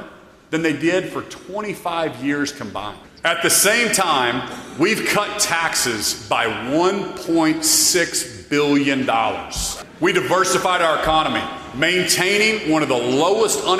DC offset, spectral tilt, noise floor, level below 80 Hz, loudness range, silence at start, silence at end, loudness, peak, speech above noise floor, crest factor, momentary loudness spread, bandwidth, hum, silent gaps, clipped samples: under 0.1%; -2.5 dB/octave; -41 dBFS; -46 dBFS; 2 LU; 0 s; 0 s; -18 LUFS; -2 dBFS; 23 dB; 16 dB; 11 LU; 15.5 kHz; none; none; under 0.1%